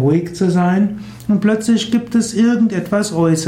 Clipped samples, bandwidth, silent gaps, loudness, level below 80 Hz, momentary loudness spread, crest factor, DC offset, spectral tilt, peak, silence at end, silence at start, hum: under 0.1%; 13.5 kHz; none; -16 LUFS; -50 dBFS; 4 LU; 12 dB; under 0.1%; -6 dB/octave; -4 dBFS; 0 s; 0 s; none